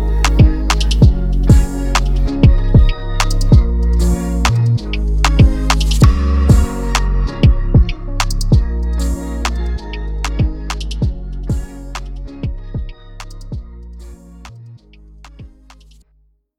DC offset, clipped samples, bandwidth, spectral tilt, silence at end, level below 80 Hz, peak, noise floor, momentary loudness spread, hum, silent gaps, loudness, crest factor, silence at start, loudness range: under 0.1%; under 0.1%; 14 kHz; -6 dB/octave; 1.1 s; -16 dBFS; 0 dBFS; -56 dBFS; 18 LU; none; none; -15 LUFS; 14 dB; 0 s; 17 LU